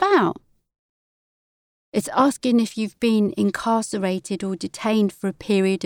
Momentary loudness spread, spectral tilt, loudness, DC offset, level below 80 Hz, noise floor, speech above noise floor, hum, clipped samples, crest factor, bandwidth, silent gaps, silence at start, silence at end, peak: 8 LU; -5.5 dB/octave; -22 LUFS; under 0.1%; -62 dBFS; under -90 dBFS; over 69 dB; none; under 0.1%; 16 dB; 17 kHz; 0.79-1.92 s; 0 s; 0 s; -6 dBFS